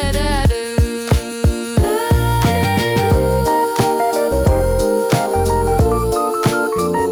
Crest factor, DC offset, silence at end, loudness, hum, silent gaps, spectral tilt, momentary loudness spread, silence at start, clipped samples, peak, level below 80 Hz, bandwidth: 12 dB; under 0.1%; 0 s; -16 LUFS; none; none; -6 dB/octave; 3 LU; 0 s; under 0.1%; -4 dBFS; -24 dBFS; over 20 kHz